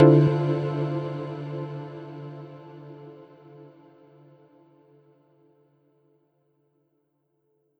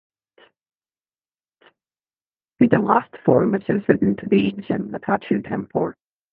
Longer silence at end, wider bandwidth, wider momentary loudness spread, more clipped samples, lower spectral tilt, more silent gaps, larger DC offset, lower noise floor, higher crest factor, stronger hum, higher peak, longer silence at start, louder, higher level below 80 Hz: first, 4.15 s vs 0.4 s; first, 5 kHz vs 4.2 kHz; first, 27 LU vs 8 LU; neither; about the same, -10.5 dB/octave vs -10.5 dB/octave; neither; neither; second, -73 dBFS vs under -90 dBFS; about the same, 24 dB vs 22 dB; neither; about the same, -2 dBFS vs 0 dBFS; second, 0 s vs 2.6 s; second, -26 LUFS vs -20 LUFS; second, -66 dBFS vs -58 dBFS